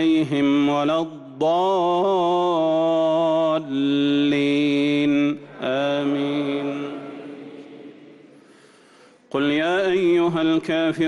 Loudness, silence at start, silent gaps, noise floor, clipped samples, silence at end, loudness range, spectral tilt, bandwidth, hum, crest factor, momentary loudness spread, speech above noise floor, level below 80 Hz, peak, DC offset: -21 LUFS; 0 s; none; -52 dBFS; under 0.1%; 0 s; 9 LU; -6.5 dB/octave; 9.8 kHz; none; 10 dB; 12 LU; 32 dB; -64 dBFS; -12 dBFS; under 0.1%